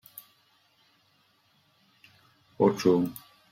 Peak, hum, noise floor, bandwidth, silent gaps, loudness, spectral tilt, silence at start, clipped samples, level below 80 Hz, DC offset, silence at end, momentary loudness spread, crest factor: -10 dBFS; none; -67 dBFS; 16 kHz; none; -26 LUFS; -6.5 dB/octave; 2.6 s; under 0.1%; -72 dBFS; under 0.1%; 0.4 s; 25 LU; 22 dB